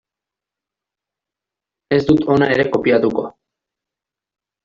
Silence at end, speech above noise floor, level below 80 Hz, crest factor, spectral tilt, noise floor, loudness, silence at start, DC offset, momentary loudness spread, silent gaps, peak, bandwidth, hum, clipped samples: 1.35 s; 71 dB; -50 dBFS; 18 dB; -5.5 dB/octave; -86 dBFS; -16 LUFS; 1.9 s; under 0.1%; 8 LU; none; -2 dBFS; 7.4 kHz; none; under 0.1%